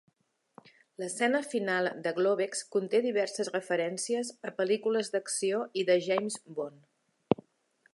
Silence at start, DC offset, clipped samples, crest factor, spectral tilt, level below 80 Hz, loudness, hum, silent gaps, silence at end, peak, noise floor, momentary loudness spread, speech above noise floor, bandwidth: 1 s; under 0.1%; under 0.1%; 26 dB; -3.5 dB/octave; -76 dBFS; -31 LUFS; none; none; 0.6 s; -6 dBFS; -74 dBFS; 9 LU; 43 dB; 11.5 kHz